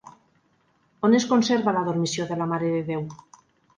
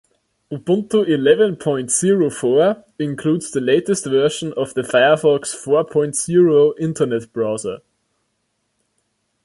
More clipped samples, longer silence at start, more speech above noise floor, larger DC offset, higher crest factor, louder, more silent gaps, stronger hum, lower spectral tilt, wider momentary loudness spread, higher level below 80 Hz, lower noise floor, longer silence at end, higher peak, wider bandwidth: neither; second, 0.05 s vs 0.5 s; second, 43 dB vs 53 dB; neither; about the same, 18 dB vs 16 dB; second, -24 LUFS vs -17 LUFS; neither; neither; about the same, -5.5 dB/octave vs -5 dB/octave; about the same, 10 LU vs 9 LU; second, -66 dBFS vs -60 dBFS; second, -65 dBFS vs -70 dBFS; second, 0.6 s vs 1.7 s; second, -6 dBFS vs -2 dBFS; second, 9.8 kHz vs 11.5 kHz